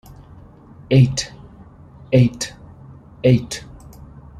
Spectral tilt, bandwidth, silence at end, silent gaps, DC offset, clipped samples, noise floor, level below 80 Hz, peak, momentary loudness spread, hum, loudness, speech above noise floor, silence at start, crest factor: -6.5 dB/octave; 12 kHz; 0 s; none; under 0.1%; under 0.1%; -43 dBFS; -46 dBFS; -2 dBFS; 16 LU; none; -18 LUFS; 28 dB; 0.9 s; 18 dB